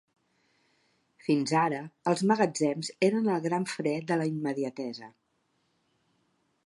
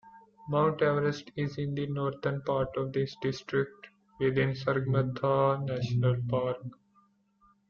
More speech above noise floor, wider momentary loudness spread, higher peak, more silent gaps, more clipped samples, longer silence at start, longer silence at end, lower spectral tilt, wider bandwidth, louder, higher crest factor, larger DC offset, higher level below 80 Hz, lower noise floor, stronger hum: first, 46 dB vs 38 dB; about the same, 9 LU vs 8 LU; first, -10 dBFS vs -14 dBFS; neither; neither; first, 1.25 s vs 0.05 s; first, 1.55 s vs 0.95 s; second, -5.5 dB/octave vs -8 dB/octave; first, 11.5 kHz vs 7 kHz; about the same, -29 LUFS vs -30 LUFS; about the same, 20 dB vs 16 dB; neither; second, -80 dBFS vs -60 dBFS; first, -74 dBFS vs -67 dBFS; neither